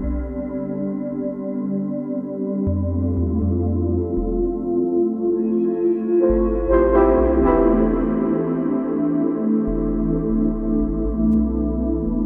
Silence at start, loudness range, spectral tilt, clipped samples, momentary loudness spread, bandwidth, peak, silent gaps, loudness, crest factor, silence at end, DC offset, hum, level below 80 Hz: 0 s; 5 LU; -12.5 dB/octave; under 0.1%; 9 LU; 3.2 kHz; -2 dBFS; none; -20 LUFS; 16 dB; 0 s; under 0.1%; none; -30 dBFS